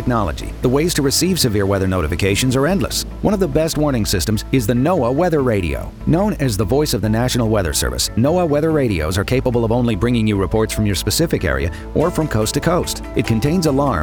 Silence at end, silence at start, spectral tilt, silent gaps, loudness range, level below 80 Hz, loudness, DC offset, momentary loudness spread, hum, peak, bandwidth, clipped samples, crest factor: 0 s; 0 s; -5 dB/octave; none; 1 LU; -30 dBFS; -17 LUFS; 0.1%; 4 LU; none; -2 dBFS; over 20 kHz; under 0.1%; 14 dB